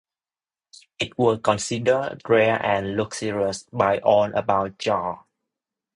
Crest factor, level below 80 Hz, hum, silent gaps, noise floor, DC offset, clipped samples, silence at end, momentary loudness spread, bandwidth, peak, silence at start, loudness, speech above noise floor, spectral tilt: 20 dB; -56 dBFS; none; none; under -90 dBFS; under 0.1%; under 0.1%; 0.8 s; 8 LU; 11 kHz; -4 dBFS; 1 s; -22 LUFS; over 68 dB; -5 dB/octave